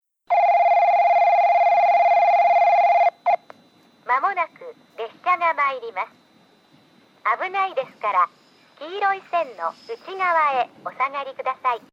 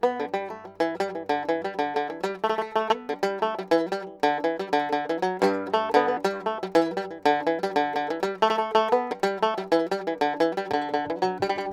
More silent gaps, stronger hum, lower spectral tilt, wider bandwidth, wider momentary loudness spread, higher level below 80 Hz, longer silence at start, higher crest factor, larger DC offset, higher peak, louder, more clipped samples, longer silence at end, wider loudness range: neither; neither; second, -3 dB/octave vs -5 dB/octave; second, 6.6 kHz vs 15 kHz; first, 14 LU vs 6 LU; second, -86 dBFS vs -68 dBFS; first, 0.3 s vs 0 s; second, 12 dB vs 20 dB; neither; second, -8 dBFS vs -4 dBFS; first, -20 LUFS vs -26 LUFS; neither; first, 0.15 s vs 0 s; first, 9 LU vs 2 LU